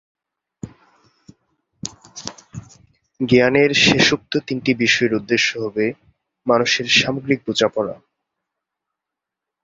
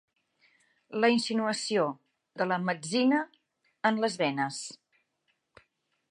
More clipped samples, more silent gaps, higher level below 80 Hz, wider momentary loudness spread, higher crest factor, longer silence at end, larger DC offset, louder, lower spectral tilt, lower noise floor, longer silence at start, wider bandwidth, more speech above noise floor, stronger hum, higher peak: neither; neither; first, -54 dBFS vs -82 dBFS; first, 24 LU vs 14 LU; about the same, 20 dB vs 20 dB; first, 1.7 s vs 1.35 s; neither; first, -17 LUFS vs -29 LUFS; about the same, -3.5 dB/octave vs -4 dB/octave; first, -84 dBFS vs -77 dBFS; second, 0.65 s vs 0.9 s; second, 8 kHz vs 11.5 kHz; first, 67 dB vs 49 dB; neither; first, 0 dBFS vs -10 dBFS